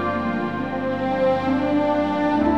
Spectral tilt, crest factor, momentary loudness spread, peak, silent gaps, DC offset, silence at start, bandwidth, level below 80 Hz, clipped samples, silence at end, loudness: -7.5 dB/octave; 14 dB; 5 LU; -8 dBFS; none; 0.5%; 0 s; 7.6 kHz; -48 dBFS; under 0.1%; 0 s; -22 LUFS